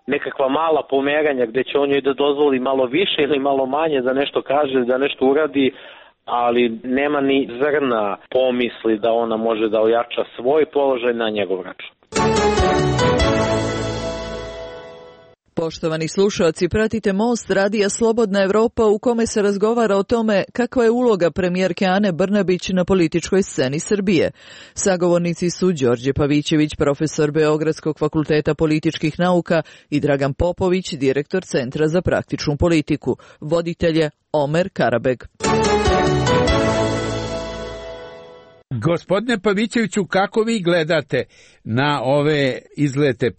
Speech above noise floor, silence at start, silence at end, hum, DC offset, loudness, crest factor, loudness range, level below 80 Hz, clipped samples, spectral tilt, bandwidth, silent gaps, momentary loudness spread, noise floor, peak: 29 dB; 0.1 s; 0.05 s; none; under 0.1%; -19 LUFS; 12 dB; 3 LU; -38 dBFS; under 0.1%; -5.5 dB/octave; 8.8 kHz; none; 7 LU; -47 dBFS; -6 dBFS